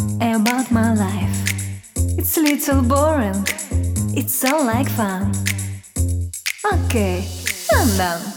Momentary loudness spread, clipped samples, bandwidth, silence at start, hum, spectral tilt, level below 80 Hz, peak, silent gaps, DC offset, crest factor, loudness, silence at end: 7 LU; under 0.1%; over 20 kHz; 0 s; none; -5 dB/octave; -32 dBFS; -2 dBFS; none; under 0.1%; 16 dB; -19 LUFS; 0 s